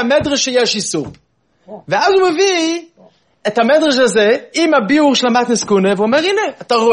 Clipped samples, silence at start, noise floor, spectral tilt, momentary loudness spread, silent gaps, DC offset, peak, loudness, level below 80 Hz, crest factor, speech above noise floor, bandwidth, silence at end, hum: under 0.1%; 0 s; -49 dBFS; -3.5 dB/octave; 8 LU; none; under 0.1%; 0 dBFS; -13 LUFS; -54 dBFS; 14 dB; 36 dB; 10.5 kHz; 0 s; none